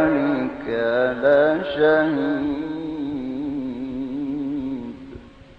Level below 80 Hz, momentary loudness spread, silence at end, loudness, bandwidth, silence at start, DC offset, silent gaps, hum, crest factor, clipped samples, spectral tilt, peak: -50 dBFS; 12 LU; 0.05 s; -22 LUFS; 5.4 kHz; 0 s; under 0.1%; none; none; 16 dB; under 0.1%; -8 dB/octave; -6 dBFS